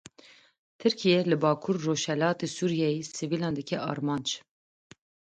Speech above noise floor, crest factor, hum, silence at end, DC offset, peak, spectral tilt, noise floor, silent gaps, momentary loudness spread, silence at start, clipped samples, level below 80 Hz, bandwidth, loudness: 29 dB; 18 dB; none; 1 s; under 0.1%; -10 dBFS; -5 dB/octave; -57 dBFS; none; 8 LU; 0.8 s; under 0.1%; -70 dBFS; 9.4 kHz; -28 LUFS